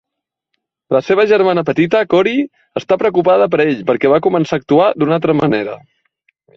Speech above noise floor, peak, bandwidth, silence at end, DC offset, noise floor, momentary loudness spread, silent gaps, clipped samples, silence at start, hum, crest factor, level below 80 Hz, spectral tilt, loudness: 67 dB; 0 dBFS; 7.2 kHz; 0.8 s; under 0.1%; -80 dBFS; 7 LU; none; under 0.1%; 0.9 s; none; 14 dB; -54 dBFS; -7.5 dB/octave; -14 LUFS